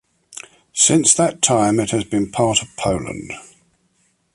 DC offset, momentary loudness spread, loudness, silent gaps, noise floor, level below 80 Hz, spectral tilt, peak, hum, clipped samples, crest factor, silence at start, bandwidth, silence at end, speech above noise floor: under 0.1%; 23 LU; -16 LUFS; none; -63 dBFS; -46 dBFS; -3.5 dB/octave; 0 dBFS; none; under 0.1%; 20 dB; 0.3 s; 11.5 kHz; 0.95 s; 46 dB